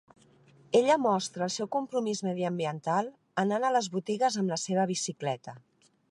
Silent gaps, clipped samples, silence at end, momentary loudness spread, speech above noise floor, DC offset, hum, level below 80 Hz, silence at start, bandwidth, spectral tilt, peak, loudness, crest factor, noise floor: none; under 0.1%; 0.5 s; 7 LU; 31 dB; under 0.1%; none; -80 dBFS; 0.7 s; 11.5 kHz; -4.5 dB/octave; -10 dBFS; -29 LUFS; 18 dB; -60 dBFS